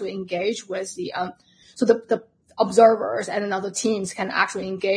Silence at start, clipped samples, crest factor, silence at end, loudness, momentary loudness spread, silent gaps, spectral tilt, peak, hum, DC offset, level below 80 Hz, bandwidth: 0 s; under 0.1%; 20 dB; 0 s; -23 LUFS; 13 LU; none; -4 dB/octave; -2 dBFS; none; under 0.1%; -66 dBFS; 10.5 kHz